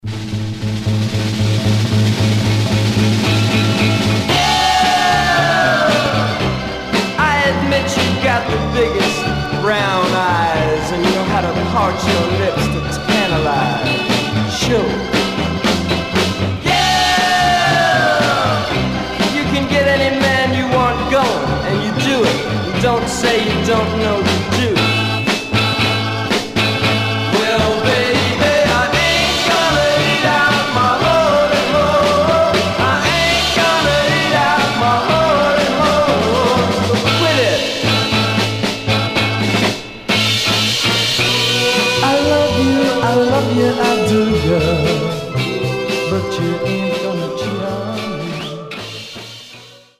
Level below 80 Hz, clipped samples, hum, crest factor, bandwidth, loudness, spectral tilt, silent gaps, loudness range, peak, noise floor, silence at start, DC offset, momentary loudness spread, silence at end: -36 dBFS; under 0.1%; none; 14 dB; 16 kHz; -14 LUFS; -4.5 dB/octave; none; 3 LU; 0 dBFS; -39 dBFS; 0.05 s; 0.2%; 6 LU; 0.3 s